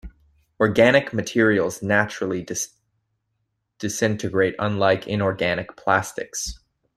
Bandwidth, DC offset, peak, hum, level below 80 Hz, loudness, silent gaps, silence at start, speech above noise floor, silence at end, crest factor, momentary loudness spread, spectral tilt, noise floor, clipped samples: 14.5 kHz; under 0.1%; -2 dBFS; none; -50 dBFS; -22 LUFS; none; 0.05 s; 54 dB; 0.4 s; 20 dB; 12 LU; -4.5 dB/octave; -75 dBFS; under 0.1%